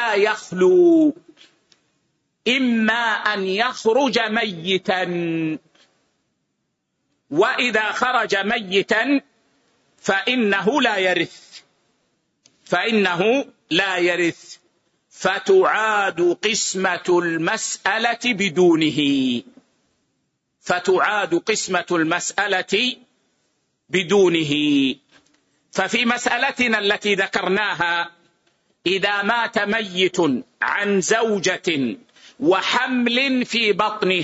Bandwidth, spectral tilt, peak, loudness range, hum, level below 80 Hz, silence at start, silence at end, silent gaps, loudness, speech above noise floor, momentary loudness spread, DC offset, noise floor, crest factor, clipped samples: 8 kHz; -3.5 dB/octave; -4 dBFS; 3 LU; none; -64 dBFS; 0 s; 0 s; none; -19 LUFS; 55 dB; 7 LU; under 0.1%; -74 dBFS; 16 dB; under 0.1%